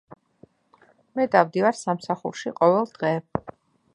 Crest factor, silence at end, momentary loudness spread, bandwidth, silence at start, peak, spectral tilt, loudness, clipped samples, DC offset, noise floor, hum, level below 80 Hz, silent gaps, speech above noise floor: 24 dB; 0.45 s; 12 LU; 10 kHz; 0.1 s; -2 dBFS; -6 dB/octave; -24 LUFS; under 0.1%; under 0.1%; -59 dBFS; none; -60 dBFS; none; 37 dB